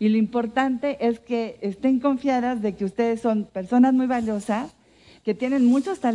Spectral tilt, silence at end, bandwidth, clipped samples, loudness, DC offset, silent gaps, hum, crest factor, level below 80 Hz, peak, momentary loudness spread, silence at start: -7 dB/octave; 0 s; 11 kHz; under 0.1%; -23 LUFS; under 0.1%; none; none; 14 dB; -60 dBFS; -8 dBFS; 9 LU; 0 s